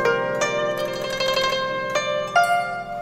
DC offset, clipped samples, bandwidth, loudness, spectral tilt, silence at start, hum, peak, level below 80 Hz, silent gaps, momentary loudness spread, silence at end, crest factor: under 0.1%; under 0.1%; 16 kHz; -22 LUFS; -2.5 dB/octave; 0 s; none; -6 dBFS; -52 dBFS; none; 6 LU; 0 s; 16 dB